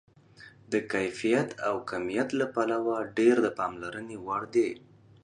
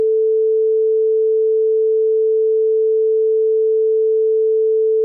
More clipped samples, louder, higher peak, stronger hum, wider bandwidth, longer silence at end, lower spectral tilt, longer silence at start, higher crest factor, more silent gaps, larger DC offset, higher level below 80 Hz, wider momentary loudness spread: neither; second, -29 LUFS vs -16 LUFS; about the same, -10 dBFS vs -12 dBFS; neither; first, 10.5 kHz vs 0.5 kHz; first, 0.45 s vs 0 s; second, -5.5 dB/octave vs -10 dB/octave; first, 0.4 s vs 0 s; first, 18 dB vs 4 dB; neither; neither; first, -68 dBFS vs under -90 dBFS; first, 10 LU vs 0 LU